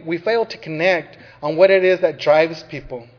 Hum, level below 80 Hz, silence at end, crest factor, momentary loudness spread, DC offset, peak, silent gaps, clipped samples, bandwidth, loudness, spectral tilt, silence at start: none; -54 dBFS; 0.15 s; 18 dB; 16 LU; under 0.1%; 0 dBFS; none; under 0.1%; 5.4 kHz; -17 LUFS; -6 dB/octave; 0.05 s